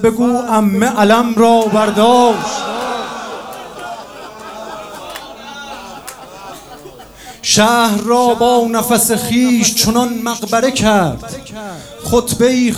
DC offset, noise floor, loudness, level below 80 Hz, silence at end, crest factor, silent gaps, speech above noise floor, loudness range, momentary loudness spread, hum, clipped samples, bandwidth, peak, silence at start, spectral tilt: under 0.1%; -35 dBFS; -12 LUFS; -42 dBFS; 0 s; 14 dB; none; 23 dB; 17 LU; 20 LU; none; under 0.1%; over 20 kHz; 0 dBFS; 0 s; -3.5 dB/octave